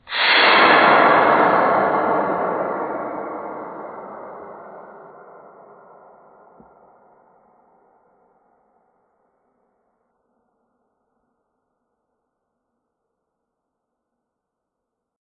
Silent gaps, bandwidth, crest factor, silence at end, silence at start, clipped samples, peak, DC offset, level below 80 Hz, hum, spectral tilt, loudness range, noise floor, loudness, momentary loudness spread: none; 4.8 kHz; 22 dB; 10.3 s; 0.1 s; under 0.1%; 0 dBFS; under 0.1%; -68 dBFS; none; -8.5 dB/octave; 26 LU; -81 dBFS; -16 LUFS; 25 LU